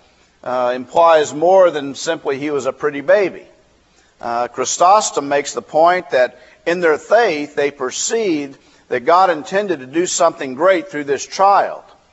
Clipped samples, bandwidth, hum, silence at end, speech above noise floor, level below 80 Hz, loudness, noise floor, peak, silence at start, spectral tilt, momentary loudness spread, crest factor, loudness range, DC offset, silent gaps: under 0.1%; 8.2 kHz; none; 0.3 s; 38 dB; -64 dBFS; -16 LUFS; -54 dBFS; 0 dBFS; 0.45 s; -3 dB/octave; 10 LU; 16 dB; 2 LU; under 0.1%; none